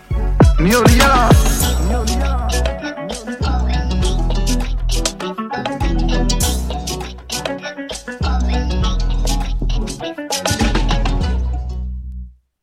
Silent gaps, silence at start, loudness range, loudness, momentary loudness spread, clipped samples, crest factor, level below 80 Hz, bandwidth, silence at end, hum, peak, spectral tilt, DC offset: none; 0.1 s; 6 LU; -18 LUFS; 14 LU; under 0.1%; 16 dB; -18 dBFS; 16.5 kHz; 0.3 s; none; 0 dBFS; -4.5 dB/octave; under 0.1%